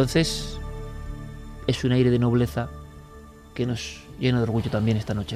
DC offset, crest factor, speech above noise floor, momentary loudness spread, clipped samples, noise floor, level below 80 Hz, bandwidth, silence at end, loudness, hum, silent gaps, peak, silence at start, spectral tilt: under 0.1%; 18 dB; 22 dB; 19 LU; under 0.1%; -45 dBFS; -40 dBFS; 15 kHz; 0 s; -25 LUFS; none; none; -8 dBFS; 0 s; -6 dB/octave